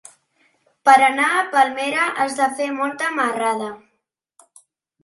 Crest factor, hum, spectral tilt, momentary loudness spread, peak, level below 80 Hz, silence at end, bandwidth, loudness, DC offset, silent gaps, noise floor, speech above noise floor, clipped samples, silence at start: 20 dB; none; -2 dB/octave; 10 LU; 0 dBFS; -76 dBFS; 1.25 s; 11.5 kHz; -18 LUFS; under 0.1%; none; -73 dBFS; 55 dB; under 0.1%; 0.85 s